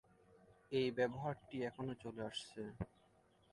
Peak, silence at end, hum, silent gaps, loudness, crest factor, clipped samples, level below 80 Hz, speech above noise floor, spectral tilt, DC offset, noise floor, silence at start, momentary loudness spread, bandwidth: -24 dBFS; 0.65 s; none; none; -44 LUFS; 20 dB; under 0.1%; -68 dBFS; 30 dB; -6 dB/octave; under 0.1%; -72 dBFS; 0.3 s; 11 LU; 11.5 kHz